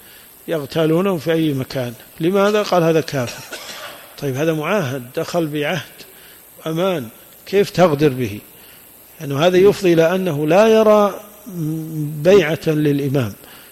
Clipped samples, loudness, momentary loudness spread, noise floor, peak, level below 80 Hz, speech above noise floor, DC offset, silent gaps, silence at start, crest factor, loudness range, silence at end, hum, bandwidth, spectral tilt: under 0.1%; -17 LUFS; 18 LU; -43 dBFS; -2 dBFS; -54 dBFS; 27 dB; under 0.1%; none; 0.45 s; 14 dB; 7 LU; 0.15 s; none; 16.5 kHz; -6 dB/octave